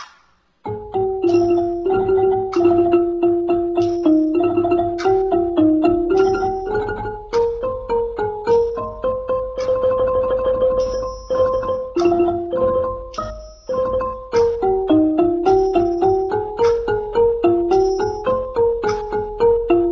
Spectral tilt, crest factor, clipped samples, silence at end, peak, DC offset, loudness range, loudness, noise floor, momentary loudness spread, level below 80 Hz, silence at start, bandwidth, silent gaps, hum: -7 dB/octave; 16 dB; under 0.1%; 0 s; -2 dBFS; under 0.1%; 3 LU; -18 LUFS; -56 dBFS; 7 LU; -40 dBFS; 0 s; 7 kHz; none; none